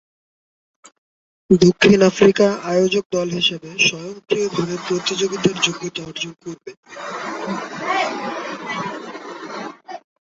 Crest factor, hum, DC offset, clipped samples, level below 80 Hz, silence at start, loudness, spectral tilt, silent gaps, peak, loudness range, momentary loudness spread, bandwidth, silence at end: 20 dB; none; under 0.1%; under 0.1%; -56 dBFS; 1.5 s; -19 LUFS; -4.5 dB/octave; 3.06-3.10 s, 6.77-6.83 s; 0 dBFS; 10 LU; 20 LU; 8 kHz; 0.25 s